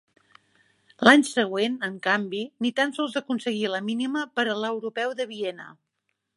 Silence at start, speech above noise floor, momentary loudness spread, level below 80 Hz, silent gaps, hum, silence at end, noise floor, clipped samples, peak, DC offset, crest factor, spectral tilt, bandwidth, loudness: 1 s; 54 dB; 12 LU; -76 dBFS; none; none; 0.65 s; -78 dBFS; under 0.1%; -2 dBFS; under 0.1%; 24 dB; -4 dB/octave; 11.5 kHz; -25 LUFS